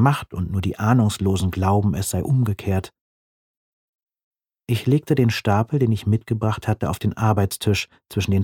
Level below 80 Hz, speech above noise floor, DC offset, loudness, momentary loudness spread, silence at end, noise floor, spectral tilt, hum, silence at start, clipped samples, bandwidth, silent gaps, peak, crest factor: -46 dBFS; over 70 dB; under 0.1%; -21 LUFS; 7 LU; 0 s; under -90 dBFS; -6.5 dB/octave; none; 0 s; under 0.1%; 17 kHz; 3.01-4.07 s, 4.24-4.32 s; -2 dBFS; 18 dB